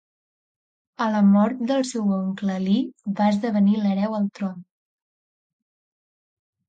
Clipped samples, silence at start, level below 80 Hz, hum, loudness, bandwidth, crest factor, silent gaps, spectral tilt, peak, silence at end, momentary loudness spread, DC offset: under 0.1%; 1 s; -70 dBFS; none; -22 LUFS; 9 kHz; 14 dB; none; -7 dB/octave; -8 dBFS; 2.05 s; 10 LU; under 0.1%